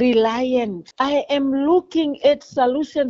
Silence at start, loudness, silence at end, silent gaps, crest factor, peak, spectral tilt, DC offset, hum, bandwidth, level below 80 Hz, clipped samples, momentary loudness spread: 0 s; -19 LUFS; 0 s; none; 14 dB; -4 dBFS; -3 dB/octave; under 0.1%; none; 7.6 kHz; -56 dBFS; under 0.1%; 5 LU